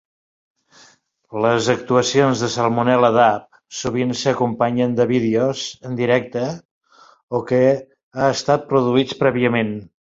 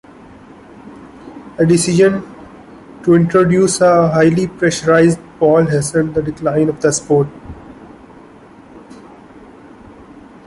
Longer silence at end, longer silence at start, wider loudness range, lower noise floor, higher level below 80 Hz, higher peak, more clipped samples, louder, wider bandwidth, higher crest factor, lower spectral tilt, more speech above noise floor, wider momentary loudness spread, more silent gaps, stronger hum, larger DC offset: second, 0.25 s vs 1.7 s; first, 1.3 s vs 0.85 s; second, 3 LU vs 8 LU; first, -53 dBFS vs -40 dBFS; second, -56 dBFS vs -46 dBFS; about the same, 0 dBFS vs -2 dBFS; neither; second, -18 LUFS vs -13 LUFS; second, 7.8 kHz vs 11.5 kHz; about the same, 18 dB vs 14 dB; about the same, -5.5 dB/octave vs -6 dB/octave; first, 36 dB vs 28 dB; second, 11 LU vs 21 LU; first, 6.65-6.81 s, 7.23-7.28 s, 8.03-8.11 s vs none; neither; neither